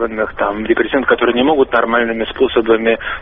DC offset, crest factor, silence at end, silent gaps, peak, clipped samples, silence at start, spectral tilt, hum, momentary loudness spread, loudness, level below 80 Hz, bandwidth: under 0.1%; 14 dB; 0 s; none; 0 dBFS; under 0.1%; 0 s; -2 dB/octave; none; 5 LU; -14 LUFS; -40 dBFS; 3.9 kHz